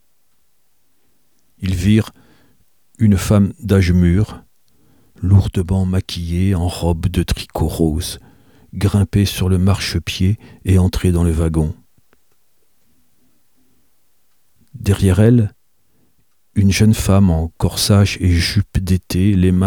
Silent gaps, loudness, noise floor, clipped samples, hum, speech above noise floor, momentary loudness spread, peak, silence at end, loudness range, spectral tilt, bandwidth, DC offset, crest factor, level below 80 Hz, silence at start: none; -16 LUFS; -65 dBFS; under 0.1%; none; 50 dB; 10 LU; 0 dBFS; 0 s; 5 LU; -6.5 dB/octave; 17.5 kHz; 0.2%; 16 dB; -30 dBFS; 1.6 s